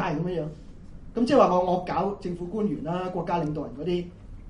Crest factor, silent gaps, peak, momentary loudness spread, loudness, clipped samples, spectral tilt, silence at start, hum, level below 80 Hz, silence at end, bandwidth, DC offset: 20 dB; none; -6 dBFS; 14 LU; -26 LUFS; under 0.1%; -7.5 dB/octave; 0 s; none; -46 dBFS; 0 s; 10.5 kHz; under 0.1%